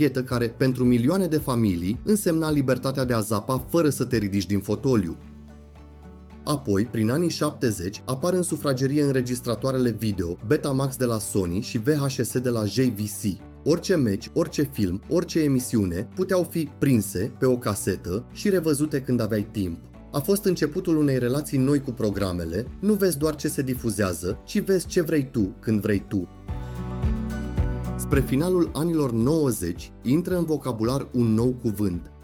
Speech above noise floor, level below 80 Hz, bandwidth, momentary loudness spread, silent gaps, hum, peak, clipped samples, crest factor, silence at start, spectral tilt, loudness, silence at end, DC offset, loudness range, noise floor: 22 dB; -42 dBFS; 18 kHz; 7 LU; none; none; -8 dBFS; under 0.1%; 16 dB; 0 s; -6 dB/octave; -25 LUFS; 0 s; under 0.1%; 3 LU; -45 dBFS